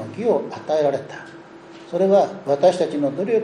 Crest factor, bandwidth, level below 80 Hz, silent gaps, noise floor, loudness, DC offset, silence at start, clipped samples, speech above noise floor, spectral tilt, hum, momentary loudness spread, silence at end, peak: 16 dB; 10.5 kHz; -68 dBFS; none; -41 dBFS; -20 LUFS; under 0.1%; 0 s; under 0.1%; 22 dB; -6.5 dB/octave; none; 14 LU; 0 s; -4 dBFS